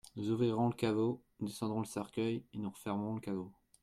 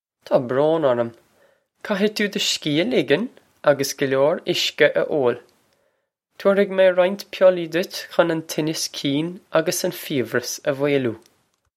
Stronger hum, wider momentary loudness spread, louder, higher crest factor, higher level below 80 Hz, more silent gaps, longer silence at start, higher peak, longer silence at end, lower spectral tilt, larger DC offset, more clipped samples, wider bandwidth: neither; about the same, 10 LU vs 8 LU; second, -37 LUFS vs -21 LUFS; about the same, 16 dB vs 20 dB; about the same, -72 dBFS vs -70 dBFS; neither; second, 0.05 s vs 0.3 s; second, -20 dBFS vs 0 dBFS; second, 0.3 s vs 0.6 s; first, -7 dB/octave vs -4 dB/octave; neither; neither; about the same, 15.5 kHz vs 16.5 kHz